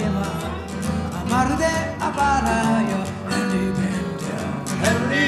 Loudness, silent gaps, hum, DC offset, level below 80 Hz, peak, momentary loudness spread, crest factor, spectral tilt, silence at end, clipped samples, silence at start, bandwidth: -22 LUFS; none; none; under 0.1%; -38 dBFS; -6 dBFS; 8 LU; 16 dB; -5 dB/octave; 0 s; under 0.1%; 0 s; 14.5 kHz